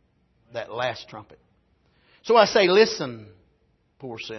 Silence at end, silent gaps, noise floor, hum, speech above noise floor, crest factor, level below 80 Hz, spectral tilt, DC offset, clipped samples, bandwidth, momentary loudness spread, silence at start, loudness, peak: 0 s; none; -66 dBFS; none; 44 dB; 22 dB; -66 dBFS; -4 dB/octave; under 0.1%; under 0.1%; 6.2 kHz; 25 LU; 0.55 s; -21 LUFS; -4 dBFS